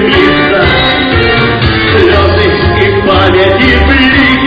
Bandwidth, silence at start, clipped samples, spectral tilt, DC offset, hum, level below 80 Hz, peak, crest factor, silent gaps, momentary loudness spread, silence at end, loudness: 8 kHz; 0 s; 0.7%; -7.5 dB/octave; under 0.1%; none; -18 dBFS; 0 dBFS; 6 dB; none; 3 LU; 0 s; -6 LUFS